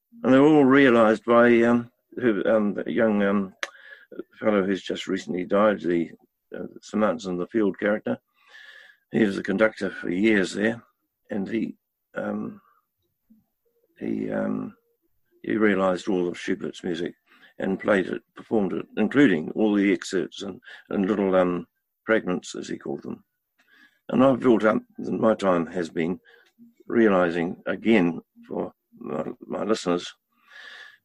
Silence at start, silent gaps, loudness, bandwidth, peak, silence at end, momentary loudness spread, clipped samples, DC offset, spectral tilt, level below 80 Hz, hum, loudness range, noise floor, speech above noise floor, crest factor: 0.15 s; none; -24 LUFS; 11 kHz; -6 dBFS; 0.2 s; 17 LU; under 0.1%; under 0.1%; -6.5 dB/octave; -62 dBFS; none; 6 LU; -75 dBFS; 51 dB; 18 dB